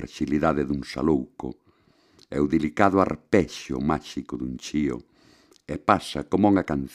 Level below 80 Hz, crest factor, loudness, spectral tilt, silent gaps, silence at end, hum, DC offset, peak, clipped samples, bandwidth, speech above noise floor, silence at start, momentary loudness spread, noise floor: -46 dBFS; 24 dB; -25 LUFS; -6.5 dB/octave; none; 0 s; none; under 0.1%; -2 dBFS; under 0.1%; 12.5 kHz; 37 dB; 0 s; 13 LU; -61 dBFS